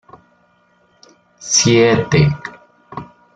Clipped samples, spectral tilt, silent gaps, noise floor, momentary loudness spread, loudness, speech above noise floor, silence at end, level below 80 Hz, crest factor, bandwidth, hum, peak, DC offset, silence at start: under 0.1%; -4 dB/octave; none; -56 dBFS; 22 LU; -13 LUFS; 43 dB; 0.3 s; -44 dBFS; 16 dB; 9.2 kHz; 60 Hz at -40 dBFS; -2 dBFS; under 0.1%; 1.4 s